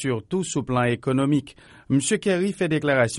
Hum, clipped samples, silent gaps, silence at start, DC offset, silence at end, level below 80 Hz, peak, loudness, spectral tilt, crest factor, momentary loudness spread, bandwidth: none; under 0.1%; none; 0 s; under 0.1%; 0 s; -56 dBFS; -8 dBFS; -23 LUFS; -5.5 dB/octave; 16 dB; 5 LU; 11.5 kHz